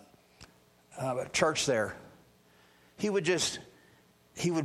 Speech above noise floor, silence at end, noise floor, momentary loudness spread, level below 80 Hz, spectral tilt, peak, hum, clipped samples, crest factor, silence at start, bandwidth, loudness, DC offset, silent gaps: 33 dB; 0 s; -63 dBFS; 19 LU; -66 dBFS; -3.5 dB/octave; -12 dBFS; none; under 0.1%; 22 dB; 0.4 s; 15 kHz; -31 LUFS; under 0.1%; none